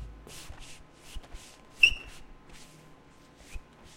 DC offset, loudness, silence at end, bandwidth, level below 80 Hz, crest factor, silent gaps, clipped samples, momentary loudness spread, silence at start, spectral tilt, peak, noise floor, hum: under 0.1%; -23 LUFS; 0 s; 16 kHz; -48 dBFS; 28 dB; none; under 0.1%; 29 LU; 0 s; -1 dB/octave; -6 dBFS; -55 dBFS; none